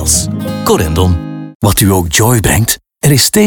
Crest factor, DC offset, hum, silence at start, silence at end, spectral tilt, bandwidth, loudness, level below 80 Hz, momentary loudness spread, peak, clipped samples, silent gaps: 10 dB; under 0.1%; none; 0 s; 0 s; -4 dB/octave; 19.5 kHz; -11 LUFS; -26 dBFS; 7 LU; 0 dBFS; under 0.1%; 1.55-1.60 s